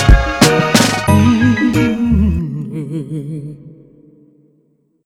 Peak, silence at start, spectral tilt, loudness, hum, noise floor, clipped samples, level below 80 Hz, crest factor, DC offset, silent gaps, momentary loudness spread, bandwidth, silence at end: 0 dBFS; 0 s; -5 dB/octave; -14 LUFS; none; -58 dBFS; under 0.1%; -22 dBFS; 14 dB; under 0.1%; none; 14 LU; 18.5 kHz; 1.35 s